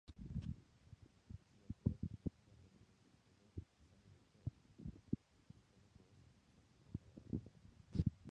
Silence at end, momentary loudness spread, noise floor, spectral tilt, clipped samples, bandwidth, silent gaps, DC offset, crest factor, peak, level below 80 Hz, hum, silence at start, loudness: 0 s; 24 LU; -72 dBFS; -9 dB/octave; under 0.1%; 9.4 kHz; none; under 0.1%; 28 dB; -22 dBFS; -58 dBFS; none; 0.1 s; -49 LUFS